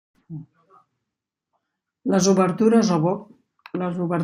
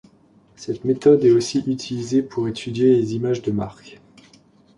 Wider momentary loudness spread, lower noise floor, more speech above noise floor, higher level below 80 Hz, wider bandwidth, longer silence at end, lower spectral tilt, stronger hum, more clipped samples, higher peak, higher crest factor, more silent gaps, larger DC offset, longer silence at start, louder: first, 22 LU vs 12 LU; first, -84 dBFS vs -54 dBFS; first, 65 dB vs 35 dB; second, -66 dBFS vs -56 dBFS; first, 15 kHz vs 11 kHz; second, 0 s vs 0.85 s; about the same, -6 dB/octave vs -6.5 dB/octave; neither; neither; about the same, -6 dBFS vs -4 dBFS; about the same, 18 dB vs 18 dB; neither; neither; second, 0.3 s vs 0.6 s; about the same, -21 LUFS vs -20 LUFS